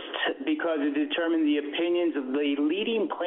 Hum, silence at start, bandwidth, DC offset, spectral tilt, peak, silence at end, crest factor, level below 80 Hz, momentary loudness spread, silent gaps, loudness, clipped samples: none; 0 s; 4 kHz; under 0.1%; -1.5 dB/octave; -16 dBFS; 0 s; 10 dB; -78 dBFS; 3 LU; none; -27 LUFS; under 0.1%